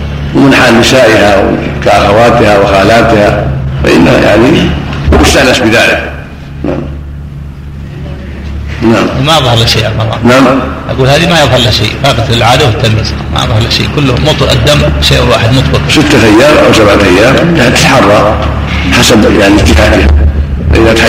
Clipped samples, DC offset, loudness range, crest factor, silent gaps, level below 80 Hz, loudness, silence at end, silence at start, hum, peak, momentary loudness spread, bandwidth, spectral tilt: 3%; 0.4%; 6 LU; 6 dB; none; -16 dBFS; -5 LUFS; 0 s; 0 s; none; 0 dBFS; 14 LU; 16.5 kHz; -5 dB/octave